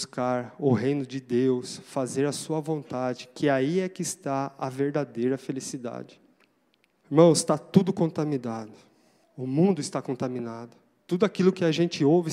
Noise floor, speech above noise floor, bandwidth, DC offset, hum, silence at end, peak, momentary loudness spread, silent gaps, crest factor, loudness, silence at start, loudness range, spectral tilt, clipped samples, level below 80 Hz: -68 dBFS; 43 dB; 15 kHz; under 0.1%; none; 0 s; -4 dBFS; 12 LU; none; 22 dB; -26 LUFS; 0 s; 5 LU; -6 dB/octave; under 0.1%; -74 dBFS